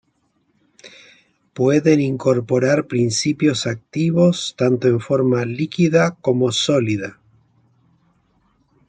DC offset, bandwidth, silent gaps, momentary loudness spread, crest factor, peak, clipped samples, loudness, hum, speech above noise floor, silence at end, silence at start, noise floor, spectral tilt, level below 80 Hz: under 0.1%; 9.4 kHz; none; 7 LU; 16 dB; -2 dBFS; under 0.1%; -18 LUFS; none; 48 dB; 1.8 s; 0.85 s; -65 dBFS; -5.5 dB/octave; -60 dBFS